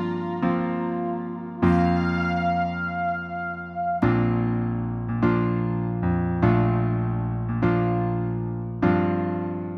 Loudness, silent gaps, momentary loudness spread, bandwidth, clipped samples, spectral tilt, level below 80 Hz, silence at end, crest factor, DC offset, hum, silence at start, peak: -24 LUFS; none; 8 LU; 6 kHz; under 0.1%; -10 dB/octave; -42 dBFS; 0 s; 16 dB; under 0.1%; none; 0 s; -6 dBFS